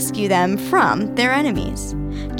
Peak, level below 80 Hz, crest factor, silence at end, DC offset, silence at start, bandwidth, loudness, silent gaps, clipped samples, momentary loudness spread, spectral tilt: -4 dBFS; -34 dBFS; 16 dB; 0 s; under 0.1%; 0 s; 18.5 kHz; -19 LUFS; none; under 0.1%; 10 LU; -4.5 dB/octave